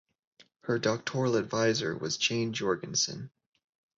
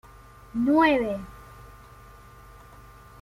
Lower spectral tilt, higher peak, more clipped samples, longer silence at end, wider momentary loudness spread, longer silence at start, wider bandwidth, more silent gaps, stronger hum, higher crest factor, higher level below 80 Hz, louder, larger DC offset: second, -3.5 dB/octave vs -6.5 dB/octave; second, -12 dBFS vs -8 dBFS; neither; second, 0.7 s vs 1.5 s; second, 7 LU vs 27 LU; second, 0.4 s vs 0.55 s; second, 8 kHz vs 15.5 kHz; neither; neither; about the same, 18 dB vs 20 dB; second, -68 dBFS vs -52 dBFS; second, -30 LUFS vs -23 LUFS; neither